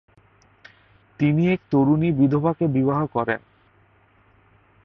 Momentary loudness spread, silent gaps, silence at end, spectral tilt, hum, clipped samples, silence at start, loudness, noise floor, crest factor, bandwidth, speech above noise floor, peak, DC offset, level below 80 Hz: 6 LU; none; 1.45 s; -10.5 dB/octave; none; under 0.1%; 1.2 s; -21 LUFS; -58 dBFS; 16 dB; 5.8 kHz; 38 dB; -8 dBFS; under 0.1%; -56 dBFS